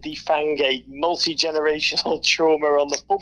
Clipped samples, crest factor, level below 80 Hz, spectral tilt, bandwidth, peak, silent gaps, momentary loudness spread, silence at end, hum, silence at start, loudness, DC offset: under 0.1%; 16 dB; -56 dBFS; -2 dB/octave; 10.5 kHz; -4 dBFS; none; 5 LU; 0 s; none; 0 s; -20 LUFS; under 0.1%